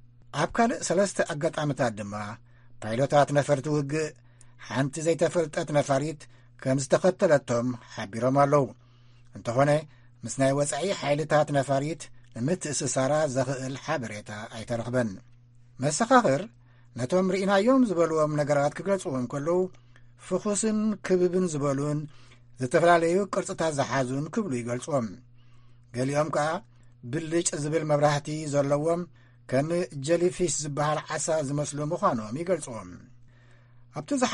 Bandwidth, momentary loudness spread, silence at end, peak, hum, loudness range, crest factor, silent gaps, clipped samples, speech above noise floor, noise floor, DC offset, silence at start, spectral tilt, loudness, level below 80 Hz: 11.5 kHz; 13 LU; 0 s; -6 dBFS; none; 4 LU; 20 dB; none; under 0.1%; 28 dB; -54 dBFS; under 0.1%; 0.05 s; -5.5 dB/octave; -27 LUFS; -58 dBFS